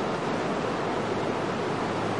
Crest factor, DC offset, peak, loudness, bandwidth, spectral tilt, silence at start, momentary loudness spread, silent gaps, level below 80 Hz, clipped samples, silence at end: 14 dB; 0.2%; -14 dBFS; -29 LUFS; 11.5 kHz; -5.5 dB/octave; 0 s; 0 LU; none; -58 dBFS; under 0.1%; 0 s